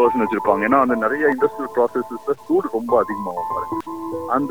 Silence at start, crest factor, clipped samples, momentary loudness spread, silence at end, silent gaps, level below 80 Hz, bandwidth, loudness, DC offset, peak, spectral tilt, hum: 0 s; 18 dB; under 0.1%; 9 LU; 0 s; none; -58 dBFS; over 20 kHz; -20 LUFS; 0.4%; -2 dBFS; -7 dB/octave; none